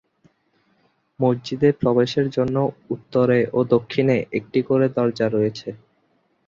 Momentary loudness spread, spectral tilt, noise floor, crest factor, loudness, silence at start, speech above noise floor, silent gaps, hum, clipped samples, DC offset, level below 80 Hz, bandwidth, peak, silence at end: 6 LU; -8 dB/octave; -65 dBFS; 18 dB; -21 LUFS; 1.2 s; 45 dB; none; none; under 0.1%; under 0.1%; -58 dBFS; 7.4 kHz; -4 dBFS; 0.7 s